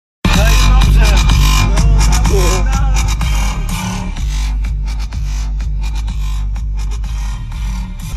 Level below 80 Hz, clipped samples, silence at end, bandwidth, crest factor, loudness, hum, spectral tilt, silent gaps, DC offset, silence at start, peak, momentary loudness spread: -14 dBFS; under 0.1%; 0 s; 13.5 kHz; 12 dB; -15 LUFS; none; -4.5 dB/octave; none; under 0.1%; 0.25 s; 0 dBFS; 11 LU